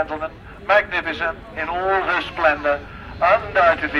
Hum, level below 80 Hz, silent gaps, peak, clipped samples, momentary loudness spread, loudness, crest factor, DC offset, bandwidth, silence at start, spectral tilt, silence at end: none; -42 dBFS; none; -2 dBFS; under 0.1%; 12 LU; -20 LUFS; 18 dB; under 0.1%; 11 kHz; 0 s; -5.5 dB/octave; 0 s